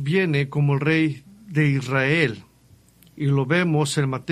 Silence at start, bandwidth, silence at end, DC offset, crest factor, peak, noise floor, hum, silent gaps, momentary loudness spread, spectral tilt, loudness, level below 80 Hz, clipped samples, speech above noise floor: 0 s; 12.5 kHz; 0 s; under 0.1%; 18 dB; -4 dBFS; -54 dBFS; none; none; 7 LU; -6 dB/octave; -21 LUFS; -58 dBFS; under 0.1%; 34 dB